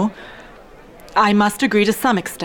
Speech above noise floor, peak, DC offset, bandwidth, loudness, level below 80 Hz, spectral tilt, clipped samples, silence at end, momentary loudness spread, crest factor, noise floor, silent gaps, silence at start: 25 dB; -4 dBFS; under 0.1%; over 20 kHz; -17 LUFS; -50 dBFS; -4.5 dB/octave; under 0.1%; 0 s; 15 LU; 14 dB; -42 dBFS; none; 0 s